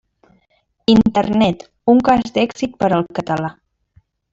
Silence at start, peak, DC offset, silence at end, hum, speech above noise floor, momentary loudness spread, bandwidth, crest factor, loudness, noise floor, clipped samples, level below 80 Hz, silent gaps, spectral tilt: 0.9 s; -2 dBFS; under 0.1%; 0.8 s; none; 48 dB; 9 LU; 7.6 kHz; 16 dB; -16 LUFS; -63 dBFS; under 0.1%; -46 dBFS; none; -6.5 dB/octave